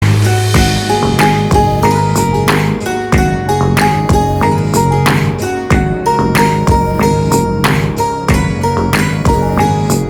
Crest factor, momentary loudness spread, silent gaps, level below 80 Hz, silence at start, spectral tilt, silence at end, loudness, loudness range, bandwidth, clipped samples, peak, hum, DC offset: 12 dB; 3 LU; none; -24 dBFS; 0 s; -5.5 dB/octave; 0 s; -12 LUFS; 1 LU; 20 kHz; under 0.1%; 0 dBFS; none; under 0.1%